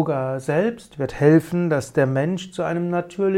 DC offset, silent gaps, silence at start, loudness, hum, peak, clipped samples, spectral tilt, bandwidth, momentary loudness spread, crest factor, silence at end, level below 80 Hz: under 0.1%; none; 0 s; -21 LUFS; none; -4 dBFS; under 0.1%; -7.5 dB/octave; 15 kHz; 9 LU; 18 dB; 0 s; -52 dBFS